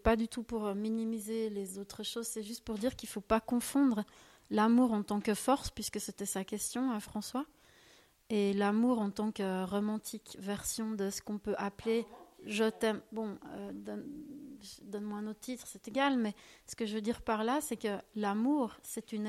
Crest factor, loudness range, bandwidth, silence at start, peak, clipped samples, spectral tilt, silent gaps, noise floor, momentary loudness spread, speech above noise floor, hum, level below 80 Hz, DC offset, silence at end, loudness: 20 dB; 6 LU; 15.5 kHz; 0.05 s; -16 dBFS; under 0.1%; -4.5 dB/octave; none; -64 dBFS; 13 LU; 29 dB; none; -58 dBFS; under 0.1%; 0 s; -35 LUFS